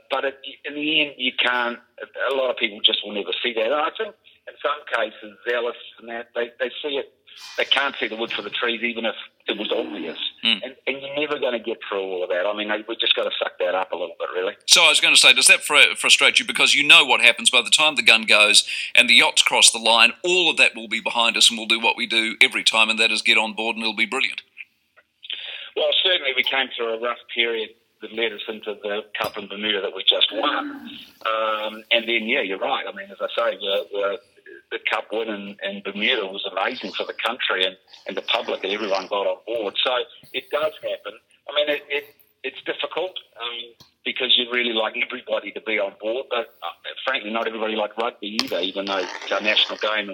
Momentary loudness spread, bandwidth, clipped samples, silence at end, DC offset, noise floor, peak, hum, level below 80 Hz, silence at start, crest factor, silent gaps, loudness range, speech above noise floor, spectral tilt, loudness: 17 LU; 18 kHz; under 0.1%; 0 s; under 0.1%; -60 dBFS; 0 dBFS; none; -76 dBFS; 0.1 s; 22 dB; none; 12 LU; 39 dB; 0 dB/octave; -19 LUFS